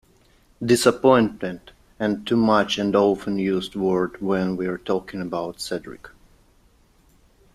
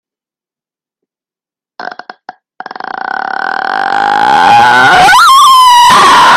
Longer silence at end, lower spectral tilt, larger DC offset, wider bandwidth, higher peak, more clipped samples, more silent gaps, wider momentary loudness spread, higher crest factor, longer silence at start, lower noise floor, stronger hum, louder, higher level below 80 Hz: first, 1.45 s vs 0 s; first, -5.5 dB/octave vs -1 dB/octave; neither; second, 15 kHz vs 17 kHz; about the same, -2 dBFS vs 0 dBFS; second, under 0.1% vs 0.8%; neither; second, 14 LU vs 21 LU; first, 20 dB vs 8 dB; second, 0.6 s vs 1.8 s; second, -58 dBFS vs -90 dBFS; neither; second, -22 LUFS vs -5 LUFS; second, -54 dBFS vs -44 dBFS